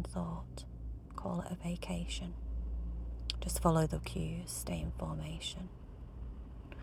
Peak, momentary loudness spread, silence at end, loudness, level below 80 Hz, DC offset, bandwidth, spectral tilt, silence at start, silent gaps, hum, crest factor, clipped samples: -14 dBFS; 15 LU; 0 s; -39 LUFS; -44 dBFS; under 0.1%; 17.5 kHz; -5.5 dB/octave; 0 s; none; none; 24 dB; under 0.1%